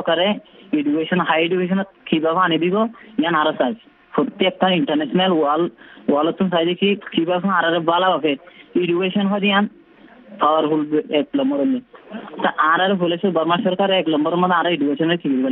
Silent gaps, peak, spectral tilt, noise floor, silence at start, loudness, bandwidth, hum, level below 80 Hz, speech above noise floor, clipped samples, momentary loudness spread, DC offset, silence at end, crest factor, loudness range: none; -2 dBFS; -10 dB/octave; -46 dBFS; 0 s; -19 LUFS; 4.1 kHz; none; -66 dBFS; 28 dB; under 0.1%; 6 LU; under 0.1%; 0 s; 16 dB; 1 LU